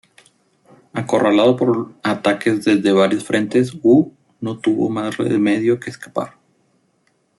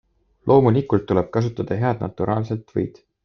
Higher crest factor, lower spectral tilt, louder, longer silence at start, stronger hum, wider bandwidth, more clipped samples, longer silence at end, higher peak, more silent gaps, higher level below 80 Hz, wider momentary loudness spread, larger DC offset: about the same, 16 dB vs 20 dB; second, -6 dB/octave vs -9.5 dB/octave; first, -17 LUFS vs -21 LUFS; first, 0.95 s vs 0.45 s; neither; first, 12 kHz vs 6.4 kHz; neither; first, 1.1 s vs 0.35 s; about the same, -2 dBFS vs -2 dBFS; neither; second, -62 dBFS vs -52 dBFS; about the same, 13 LU vs 11 LU; neither